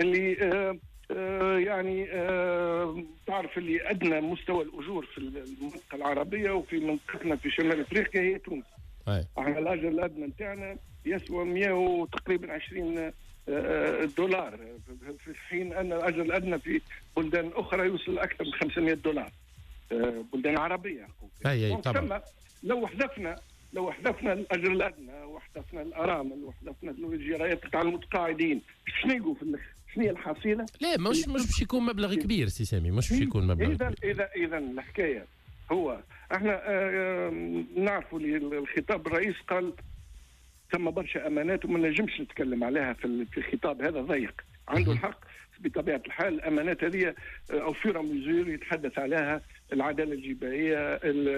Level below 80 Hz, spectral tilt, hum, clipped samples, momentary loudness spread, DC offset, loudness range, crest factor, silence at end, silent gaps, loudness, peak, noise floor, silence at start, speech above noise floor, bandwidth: -48 dBFS; -6 dB/octave; none; under 0.1%; 12 LU; under 0.1%; 3 LU; 14 dB; 0 s; none; -31 LUFS; -16 dBFS; -57 dBFS; 0 s; 26 dB; 13.5 kHz